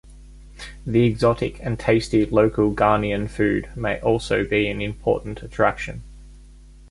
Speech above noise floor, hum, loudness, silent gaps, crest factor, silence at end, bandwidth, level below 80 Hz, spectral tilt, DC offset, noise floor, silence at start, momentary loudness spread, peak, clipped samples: 24 dB; none; -21 LUFS; none; 18 dB; 0.05 s; 11.5 kHz; -40 dBFS; -7 dB/octave; under 0.1%; -45 dBFS; 0.05 s; 14 LU; -2 dBFS; under 0.1%